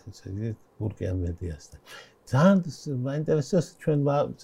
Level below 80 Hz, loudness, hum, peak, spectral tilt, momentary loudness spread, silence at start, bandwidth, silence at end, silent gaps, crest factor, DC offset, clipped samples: -50 dBFS; -27 LUFS; none; -10 dBFS; -7.5 dB/octave; 22 LU; 0.05 s; 12 kHz; 0.1 s; none; 18 dB; under 0.1%; under 0.1%